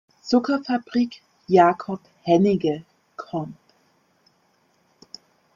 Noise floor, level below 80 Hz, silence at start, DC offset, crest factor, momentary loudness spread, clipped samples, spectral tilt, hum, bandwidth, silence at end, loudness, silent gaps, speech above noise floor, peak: -64 dBFS; -64 dBFS; 0.25 s; under 0.1%; 20 dB; 26 LU; under 0.1%; -7 dB/octave; none; 7.4 kHz; 2 s; -22 LUFS; none; 44 dB; -4 dBFS